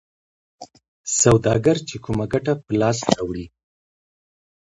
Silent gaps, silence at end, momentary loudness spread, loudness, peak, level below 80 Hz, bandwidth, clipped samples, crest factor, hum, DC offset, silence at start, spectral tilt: 0.88-1.04 s; 1.2 s; 15 LU; -20 LUFS; 0 dBFS; -46 dBFS; 11.5 kHz; under 0.1%; 22 dB; none; under 0.1%; 0.6 s; -5 dB/octave